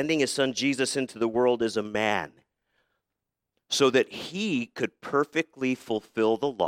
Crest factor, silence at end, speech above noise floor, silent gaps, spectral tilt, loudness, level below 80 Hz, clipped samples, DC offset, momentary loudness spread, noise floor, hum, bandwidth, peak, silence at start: 20 dB; 0 s; 59 dB; none; -4 dB/octave; -27 LUFS; -70 dBFS; under 0.1%; under 0.1%; 8 LU; -85 dBFS; none; 15.5 kHz; -8 dBFS; 0 s